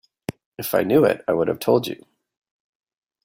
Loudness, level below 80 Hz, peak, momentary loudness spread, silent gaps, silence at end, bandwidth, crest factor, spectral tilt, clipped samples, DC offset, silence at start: -20 LUFS; -60 dBFS; -4 dBFS; 17 LU; 0.46-0.52 s; 1.3 s; 16.5 kHz; 18 dB; -6 dB/octave; under 0.1%; under 0.1%; 0.3 s